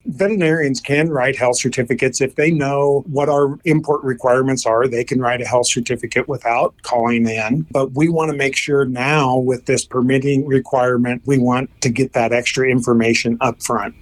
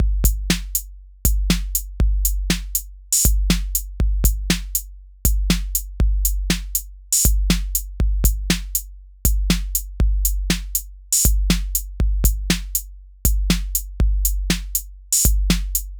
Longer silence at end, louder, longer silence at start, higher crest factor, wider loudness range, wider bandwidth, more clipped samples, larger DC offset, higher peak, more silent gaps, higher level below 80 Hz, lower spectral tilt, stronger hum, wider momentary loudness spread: about the same, 0.1 s vs 0 s; first, -17 LUFS vs -21 LUFS; about the same, 0.05 s vs 0 s; about the same, 14 dB vs 18 dB; about the same, 1 LU vs 1 LU; second, 14.5 kHz vs over 20 kHz; neither; neither; about the same, -2 dBFS vs -2 dBFS; neither; second, -50 dBFS vs -22 dBFS; first, -5 dB/octave vs -3 dB/octave; neither; second, 3 LU vs 8 LU